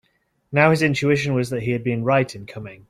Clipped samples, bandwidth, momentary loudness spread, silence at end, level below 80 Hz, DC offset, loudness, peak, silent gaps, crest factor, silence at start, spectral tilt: under 0.1%; 14 kHz; 11 LU; 0.15 s; -56 dBFS; under 0.1%; -20 LUFS; -2 dBFS; none; 18 dB; 0.5 s; -6.5 dB/octave